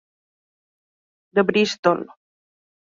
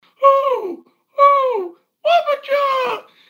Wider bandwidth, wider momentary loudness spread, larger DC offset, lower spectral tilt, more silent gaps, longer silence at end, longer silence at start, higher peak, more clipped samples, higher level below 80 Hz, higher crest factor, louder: second, 7.8 kHz vs 16.5 kHz; second, 8 LU vs 17 LU; neither; first, -5 dB/octave vs -3 dB/octave; first, 1.79-1.83 s vs none; first, 0.95 s vs 0.3 s; first, 1.35 s vs 0.2 s; second, -4 dBFS vs 0 dBFS; neither; first, -68 dBFS vs -86 dBFS; about the same, 20 dB vs 16 dB; second, -20 LUFS vs -16 LUFS